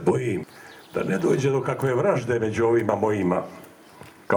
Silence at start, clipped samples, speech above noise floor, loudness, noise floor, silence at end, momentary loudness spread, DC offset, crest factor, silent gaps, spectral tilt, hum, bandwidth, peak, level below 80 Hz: 0 s; under 0.1%; 24 dB; -24 LUFS; -47 dBFS; 0 s; 11 LU; under 0.1%; 18 dB; none; -7 dB/octave; none; 19.5 kHz; -6 dBFS; -60 dBFS